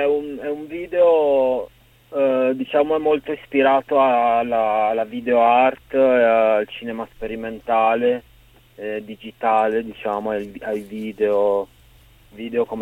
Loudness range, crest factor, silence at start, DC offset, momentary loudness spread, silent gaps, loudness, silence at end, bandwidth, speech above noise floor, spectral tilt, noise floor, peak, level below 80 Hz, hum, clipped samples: 6 LU; 16 dB; 0 s; under 0.1%; 14 LU; none; -20 LUFS; 0 s; 16 kHz; 31 dB; -6.5 dB/octave; -50 dBFS; -4 dBFS; -54 dBFS; none; under 0.1%